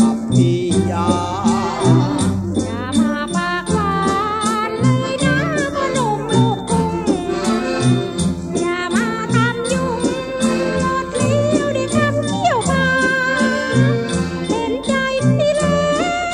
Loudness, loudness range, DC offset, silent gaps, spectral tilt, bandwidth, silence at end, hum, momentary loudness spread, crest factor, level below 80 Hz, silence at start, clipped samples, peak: -17 LUFS; 2 LU; under 0.1%; none; -5.5 dB/octave; 12 kHz; 0 s; none; 5 LU; 16 dB; -40 dBFS; 0 s; under 0.1%; -2 dBFS